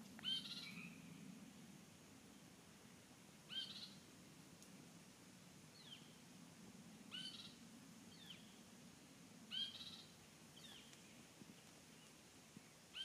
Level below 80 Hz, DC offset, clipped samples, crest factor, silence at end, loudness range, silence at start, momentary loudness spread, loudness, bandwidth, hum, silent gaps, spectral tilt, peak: -86 dBFS; under 0.1%; under 0.1%; 22 dB; 0 s; 5 LU; 0 s; 16 LU; -55 LUFS; 15.5 kHz; none; none; -2.5 dB/octave; -34 dBFS